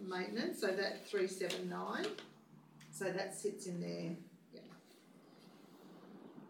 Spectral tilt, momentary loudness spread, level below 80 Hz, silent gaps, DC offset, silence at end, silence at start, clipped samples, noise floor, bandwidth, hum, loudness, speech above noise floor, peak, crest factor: -4.5 dB/octave; 23 LU; under -90 dBFS; none; under 0.1%; 0 s; 0 s; under 0.1%; -63 dBFS; 18.5 kHz; none; -41 LUFS; 22 dB; -24 dBFS; 20 dB